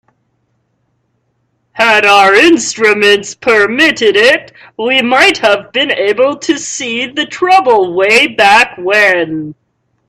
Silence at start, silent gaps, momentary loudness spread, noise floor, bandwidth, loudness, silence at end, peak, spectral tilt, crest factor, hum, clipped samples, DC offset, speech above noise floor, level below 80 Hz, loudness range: 1.75 s; none; 10 LU; -62 dBFS; 14.5 kHz; -9 LUFS; 0.55 s; 0 dBFS; -2 dB/octave; 10 dB; none; 0.2%; under 0.1%; 52 dB; -54 dBFS; 3 LU